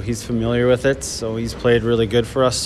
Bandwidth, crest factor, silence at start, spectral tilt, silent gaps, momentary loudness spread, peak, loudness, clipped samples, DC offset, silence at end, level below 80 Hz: 14 kHz; 16 dB; 0 s; -5 dB/octave; none; 7 LU; -4 dBFS; -19 LUFS; under 0.1%; under 0.1%; 0 s; -36 dBFS